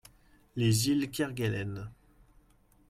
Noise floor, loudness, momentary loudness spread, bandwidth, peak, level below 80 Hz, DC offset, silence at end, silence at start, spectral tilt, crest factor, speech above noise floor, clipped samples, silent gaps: -64 dBFS; -30 LUFS; 16 LU; 16 kHz; -16 dBFS; -58 dBFS; under 0.1%; 0.95 s; 0.55 s; -5 dB/octave; 18 dB; 34 dB; under 0.1%; none